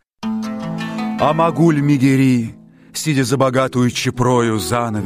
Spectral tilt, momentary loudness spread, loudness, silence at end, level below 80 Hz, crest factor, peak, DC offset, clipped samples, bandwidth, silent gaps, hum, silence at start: -6 dB/octave; 11 LU; -17 LUFS; 0 s; -46 dBFS; 14 dB; -2 dBFS; under 0.1%; under 0.1%; 15.5 kHz; none; none; 0.2 s